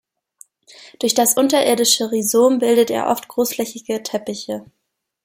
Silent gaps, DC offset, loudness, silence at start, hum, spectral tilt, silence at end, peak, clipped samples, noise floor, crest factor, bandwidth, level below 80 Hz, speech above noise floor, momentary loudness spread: none; under 0.1%; -17 LUFS; 0.8 s; none; -2.5 dB/octave; 0.6 s; -2 dBFS; under 0.1%; -76 dBFS; 18 dB; 16.5 kHz; -66 dBFS; 58 dB; 11 LU